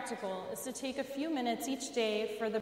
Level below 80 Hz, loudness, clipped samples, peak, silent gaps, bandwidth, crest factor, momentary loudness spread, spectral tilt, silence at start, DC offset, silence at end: -76 dBFS; -36 LUFS; under 0.1%; -20 dBFS; none; 16 kHz; 16 dB; 6 LU; -3 dB/octave; 0 s; under 0.1%; 0 s